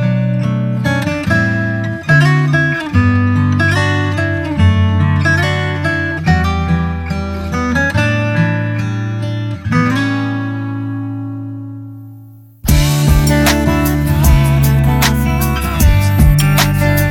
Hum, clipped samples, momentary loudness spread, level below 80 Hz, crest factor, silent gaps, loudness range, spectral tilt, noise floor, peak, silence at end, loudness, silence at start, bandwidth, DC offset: none; under 0.1%; 9 LU; -22 dBFS; 12 dB; none; 6 LU; -6 dB/octave; -37 dBFS; 0 dBFS; 0 s; -14 LUFS; 0 s; 18 kHz; under 0.1%